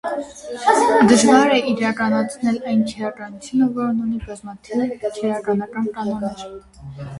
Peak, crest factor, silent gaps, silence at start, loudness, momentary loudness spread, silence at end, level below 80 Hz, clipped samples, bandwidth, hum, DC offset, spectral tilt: 0 dBFS; 18 dB; none; 0.05 s; -19 LUFS; 21 LU; 0 s; -50 dBFS; under 0.1%; 11.5 kHz; none; under 0.1%; -4.5 dB/octave